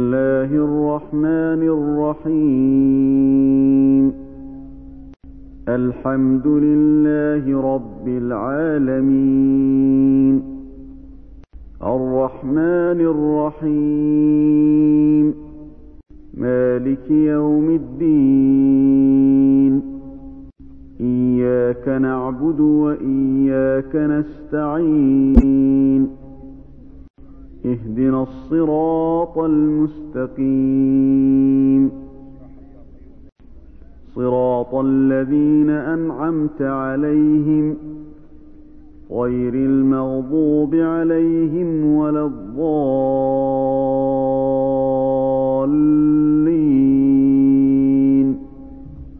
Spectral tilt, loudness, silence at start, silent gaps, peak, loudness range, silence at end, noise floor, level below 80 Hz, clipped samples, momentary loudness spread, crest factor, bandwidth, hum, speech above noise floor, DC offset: -12.5 dB/octave; -16 LUFS; 0 s; 27.10-27.14 s; 0 dBFS; 5 LU; 0 s; -40 dBFS; -38 dBFS; under 0.1%; 9 LU; 16 dB; 2.9 kHz; none; 24 dB; under 0.1%